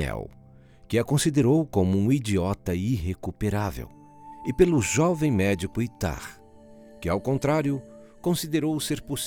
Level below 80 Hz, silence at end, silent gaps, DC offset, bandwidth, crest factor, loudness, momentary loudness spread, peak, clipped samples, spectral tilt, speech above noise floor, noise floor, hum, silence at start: -44 dBFS; 0 s; none; under 0.1%; 19 kHz; 20 dB; -25 LUFS; 12 LU; -6 dBFS; under 0.1%; -6 dB/octave; 27 dB; -51 dBFS; none; 0 s